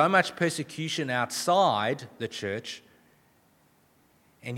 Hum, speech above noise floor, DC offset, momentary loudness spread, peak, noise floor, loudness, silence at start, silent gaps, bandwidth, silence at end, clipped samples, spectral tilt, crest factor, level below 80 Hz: none; 37 dB; under 0.1%; 14 LU; -6 dBFS; -64 dBFS; -27 LUFS; 0 s; none; 17.5 kHz; 0 s; under 0.1%; -4 dB/octave; 22 dB; -76 dBFS